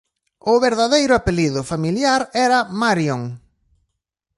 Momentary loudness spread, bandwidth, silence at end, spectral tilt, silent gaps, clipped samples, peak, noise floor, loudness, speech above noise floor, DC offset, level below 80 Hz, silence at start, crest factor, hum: 7 LU; 11.5 kHz; 1 s; -4.5 dB/octave; none; under 0.1%; -2 dBFS; -77 dBFS; -18 LUFS; 60 dB; under 0.1%; -42 dBFS; 0.45 s; 16 dB; none